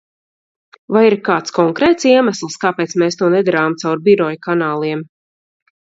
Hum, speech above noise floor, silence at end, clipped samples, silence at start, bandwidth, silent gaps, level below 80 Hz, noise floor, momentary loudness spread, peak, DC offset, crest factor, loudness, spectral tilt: none; over 76 dB; 0.9 s; under 0.1%; 0.9 s; 7.8 kHz; none; -58 dBFS; under -90 dBFS; 7 LU; 0 dBFS; under 0.1%; 16 dB; -15 LUFS; -5.5 dB/octave